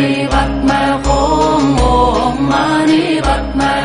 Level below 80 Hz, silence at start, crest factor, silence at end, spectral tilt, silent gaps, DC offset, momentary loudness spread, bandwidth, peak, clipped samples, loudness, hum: -22 dBFS; 0 s; 12 dB; 0 s; -5.5 dB/octave; none; under 0.1%; 3 LU; 11 kHz; 0 dBFS; under 0.1%; -13 LUFS; none